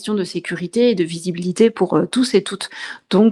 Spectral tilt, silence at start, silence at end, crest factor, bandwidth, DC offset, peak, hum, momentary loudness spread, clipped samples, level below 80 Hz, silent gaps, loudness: -5.5 dB/octave; 0 s; 0 s; 16 dB; 12 kHz; under 0.1%; -2 dBFS; none; 11 LU; under 0.1%; -64 dBFS; none; -19 LUFS